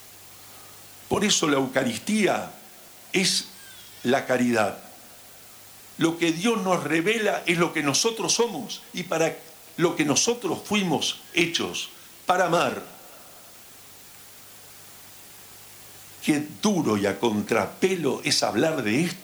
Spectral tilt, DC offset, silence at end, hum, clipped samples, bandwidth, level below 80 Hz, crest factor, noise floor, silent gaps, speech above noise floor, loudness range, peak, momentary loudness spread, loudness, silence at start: -3.5 dB/octave; under 0.1%; 0 s; none; under 0.1%; over 20 kHz; -66 dBFS; 16 dB; -47 dBFS; none; 23 dB; 6 LU; -10 dBFS; 22 LU; -24 LUFS; 0 s